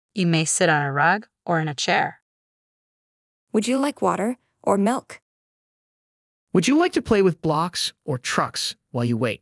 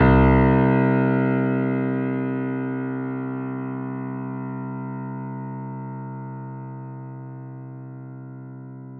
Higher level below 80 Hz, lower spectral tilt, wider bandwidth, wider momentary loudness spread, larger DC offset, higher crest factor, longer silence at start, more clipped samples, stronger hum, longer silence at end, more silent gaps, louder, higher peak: second, -58 dBFS vs -36 dBFS; second, -4.5 dB/octave vs -12 dB/octave; first, 12 kHz vs 4.3 kHz; second, 8 LU vs 20 LU; neither; about the same, 18 dB vs 18 dB; first, 0.15 s vs 0 s; neither; neither; about the same, 0.05 s vs 0 s; first, 2.22-3.47 s, 5.22-6.47 s vs none; about the same, -22 LUFS vs -23 LUFS; about the same, -4 dBFS vs -4 dBFS